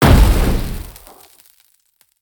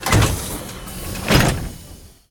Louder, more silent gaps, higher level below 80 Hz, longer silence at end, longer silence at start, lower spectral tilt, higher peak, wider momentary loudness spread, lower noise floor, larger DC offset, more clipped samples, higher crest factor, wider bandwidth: first, -16 LUFS vs -20 LUFS; neither; first, -18 dBFS vs -28 dBFS; first, 1.3 s vs 0.25 s; about the same, 0 s vs 0 s; first, -6 dB/octave vs -4.5 dB/octave; about the same, 0 dBFS vs 0 dBFS; first, 24 LU vs 18 LU; first, -59 dBFS vs -41 dBFS; neither; neither; about the same, 16 dB vs 20 dB; about the same, 20 kHz vs 19 kHz